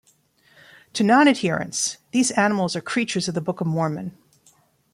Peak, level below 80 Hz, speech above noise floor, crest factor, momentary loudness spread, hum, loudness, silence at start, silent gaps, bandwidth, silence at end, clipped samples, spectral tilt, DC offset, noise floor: -4 dBFS; -66 dBFS; 39 dB; 20 dB; 10 LU; none; -21 LUFS; 0.95 s; none; 15 kHz; 0.85 s; under 0.1%; -4 dB/octave; under 0.1%; -60 dBFS